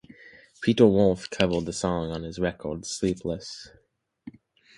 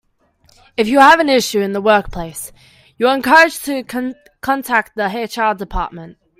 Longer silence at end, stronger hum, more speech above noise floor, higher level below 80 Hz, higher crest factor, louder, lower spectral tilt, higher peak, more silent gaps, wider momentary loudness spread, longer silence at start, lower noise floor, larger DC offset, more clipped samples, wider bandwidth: first, 0.5 s vs 0.3 s; neither; second, 27 dB vs 41 dB; second, -50 dBFS vs -38 dBFS; first, 22 dB vs 16 dB; second, -25 LUFS vs -14 LUFS; first, -5.5 dB/octave vs -3.5 dB/octave; second, -4 dBFS vs 0 dBFS; neither; about the same, 15 LU vs 17 LU; second, 0.25 s vs 0.8 s; second, -52 dBFS vs -56 dBFS; neither; neither; second, 11.5 kHz vs 16.5 kHz